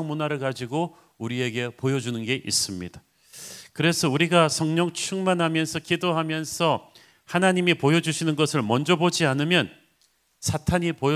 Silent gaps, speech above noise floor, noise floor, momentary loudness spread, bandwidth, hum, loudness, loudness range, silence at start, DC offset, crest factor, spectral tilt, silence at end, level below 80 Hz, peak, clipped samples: none; 42 dB; -66 dBFS; 11 LU; 16 kHz; none; -24 LUFS; 5 LU; 0 s; under 0.1%; 20 dB; -4.5 dB/octave; 0 s; -52 dBFS; -4 dBFS; under 0.1%